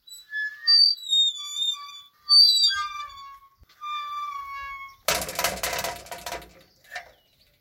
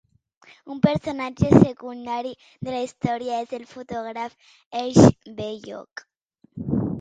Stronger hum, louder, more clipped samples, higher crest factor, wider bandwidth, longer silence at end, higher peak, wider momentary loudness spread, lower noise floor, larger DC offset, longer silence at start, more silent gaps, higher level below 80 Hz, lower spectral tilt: neither; about the same, -20 LUFS vs -22 LUFS; neither; about the same, 20 dB vs 24 dB; first, 17 kHz vs 9.2 kHz; first, 0.6 s vs 0 s; second, -6 dBFS vs 0 dBFS; first, 24 LU vs 20 LU; first, -61 dBFS vs -47 dBFS; neither; second, 0.1 s vs 0.65 s; second, none vs 4.66-4.71 s, 6.21-6.29 s; second, -56 dBFS vs -48 dBFS; second, 0.5 dB/octave vs -7 dB/octave